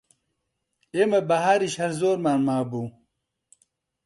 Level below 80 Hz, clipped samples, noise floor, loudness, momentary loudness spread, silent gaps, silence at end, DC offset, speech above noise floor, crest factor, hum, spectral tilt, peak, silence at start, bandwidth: -68 dBFS; under 0.1%; -78 dBFS; -23 LUFS; 11 LU; none; 1.15 s; under 0.1%; 56 dB; 18 dB; none; -5.5 dB/octave; -8 dBFS; 0.95 s; 11.5 kHz